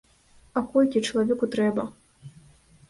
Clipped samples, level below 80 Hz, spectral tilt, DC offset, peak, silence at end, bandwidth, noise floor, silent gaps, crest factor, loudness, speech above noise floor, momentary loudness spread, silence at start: under 0.1%; -60 dBFS; -5.5 dB/octave; under 0.1%; -8 dBFS; 0.6 s; 11.5 kHz; -57 dBFS; none; 18 dB; -25 LUFS; 34 dB; 9 LU; 0.55 s